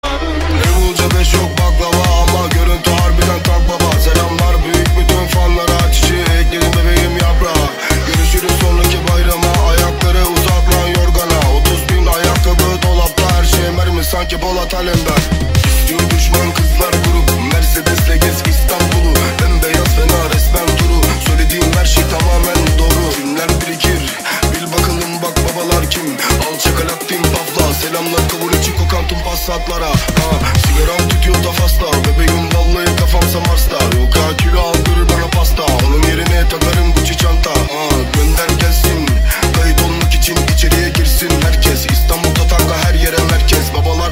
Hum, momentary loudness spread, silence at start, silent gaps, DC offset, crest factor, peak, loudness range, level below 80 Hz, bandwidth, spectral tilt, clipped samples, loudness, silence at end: none; 3 LU; 0.05 s; none; under 0.1%; 12 dB; 0 dBFS; 2 LU; -14 dBFS; 16.5 kHz; -4.5 dB/octave; under 0.1%; -13 LUFS; 0 s